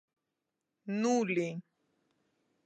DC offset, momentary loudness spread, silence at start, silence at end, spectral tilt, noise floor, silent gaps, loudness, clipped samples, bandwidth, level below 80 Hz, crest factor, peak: under 0.1%; 17 LU; 0.85 s; 1.05 s; -5.5 dB/octave; -87 dBFS; none; -33 LUFS; under 0.1%; 9 kHz; -88 dBFS; 18 dB; -18 dBFS